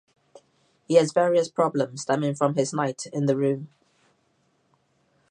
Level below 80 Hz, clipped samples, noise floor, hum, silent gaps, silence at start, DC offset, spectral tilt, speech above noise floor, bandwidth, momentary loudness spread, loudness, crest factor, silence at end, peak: -76 dBFS; under 0.1%; -68 dBFS; none; none; 0.9 s; under 0.1%; -6 dB/octave; 45 dB; 10.5 kHz; 7 LU; -24 LUFS; 20 dB; 1.65 s; -6 dBFS